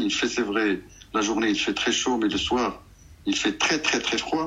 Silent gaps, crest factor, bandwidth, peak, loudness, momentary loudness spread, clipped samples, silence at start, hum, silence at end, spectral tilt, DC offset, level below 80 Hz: none; 18 dB; 10.5 kHz; -8 dBFS; -24 LUFS; 7 LU; under 0.1%; 0 s; none; 0 s; -2.5 dB/octave; under 0.1%; -52 dBFS